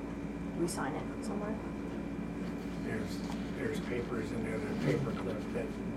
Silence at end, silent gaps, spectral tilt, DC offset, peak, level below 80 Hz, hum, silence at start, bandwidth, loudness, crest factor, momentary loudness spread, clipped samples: 0 s; none; -6.5 dB/octave; under 0.1%; -20 dBFS; -50 dBFS; none; 0 s; 15.5 kHz; -37 LUFS; 18 dB; 6 LU; under 0.1%